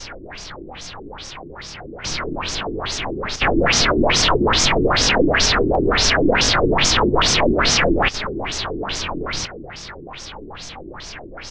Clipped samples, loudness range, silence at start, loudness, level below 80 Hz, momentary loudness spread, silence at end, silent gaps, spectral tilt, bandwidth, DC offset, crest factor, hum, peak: under 0.1%; 12 LU; 0 s; -17 LUFS; -30 dBFS; 19 LU; 0 s; none; -3 dB/octave; 11 kHz; under 0.1%; 16 dB; none; -4 dBFS